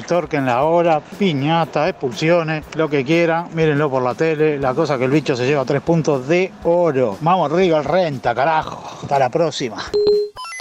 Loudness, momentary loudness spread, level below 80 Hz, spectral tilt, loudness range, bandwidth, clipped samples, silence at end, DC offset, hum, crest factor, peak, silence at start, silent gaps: -18 LUFS; 5 LU; -50 dBFS; -6.5 dB/octave; 1 LU; 11.5 kHz; under 0.1%; 0 s; under 0.1%; none; 12 dB; -6 dBFS; 0 s; none